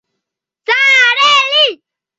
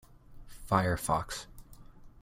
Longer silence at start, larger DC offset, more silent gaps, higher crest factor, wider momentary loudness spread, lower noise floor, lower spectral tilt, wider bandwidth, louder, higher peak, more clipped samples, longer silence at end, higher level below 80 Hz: first, 0.7 s vs 0.1 s; neither; neither; second, 12 dB vs 22 dB; second, 8 LU vs 21 LU; first, -78 dBFS vs -51 dBFS; second, 2 dB/octave vs -5 dB/octave; second, 8 kHz vs 16.5 kHz; first, -9 LUFS vs -32 LUFS; first, 0 dBFS vs -12 dBFS; neither; first, 0.45 s vs 0.05 s; second, -70 dBFS vs -50 dBFS